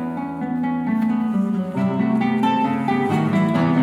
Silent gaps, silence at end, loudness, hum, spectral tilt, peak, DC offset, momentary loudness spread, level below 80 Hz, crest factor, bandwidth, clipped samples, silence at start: none; 0 s; -20 LUFS; none; -8 dB/octave; -8 dBFS; under 0.1%; 5 LU; -62 dBFS; 12 dB; 11 kHz; under 0.1%; 0 s